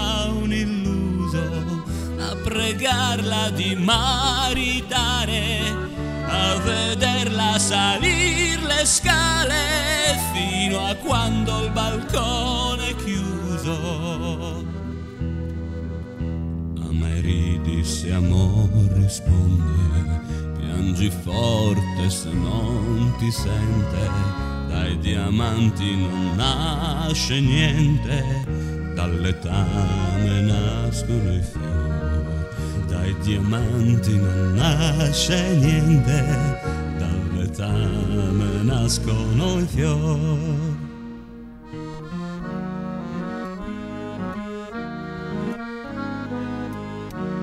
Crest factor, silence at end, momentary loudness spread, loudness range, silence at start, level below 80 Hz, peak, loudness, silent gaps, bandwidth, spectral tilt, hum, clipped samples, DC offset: 18 dB; 0 s; 12 LU; 9 LU; 0 s; -32 dBFS; -4 dBFS; -22 LUFS; none; 15.5 kHz; -4.5 dB/octave; none; under 0.1%; under 0.1%